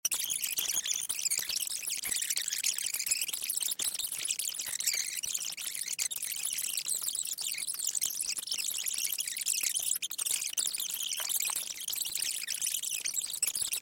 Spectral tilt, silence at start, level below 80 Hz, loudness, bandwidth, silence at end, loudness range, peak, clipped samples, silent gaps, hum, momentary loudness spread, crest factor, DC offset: 3.5 dB/octave; 0.05 s; -74 dBFS; -31 LUFS; 17 kHz; 0 s; 1 LU; -16 dBFS; under 0.1%; none; none; 3 LU; 18 dB; under 0.1%